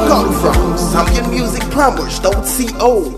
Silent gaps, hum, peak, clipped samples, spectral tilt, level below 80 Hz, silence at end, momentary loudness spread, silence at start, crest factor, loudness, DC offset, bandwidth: none; none; 0 dBFS; 0.2%; -5 dB/octave; -20 dBFS; 0 s; 4 LU; 0 s; 14 dB; -14 LUFS; under 0.1%; 14.5 kHz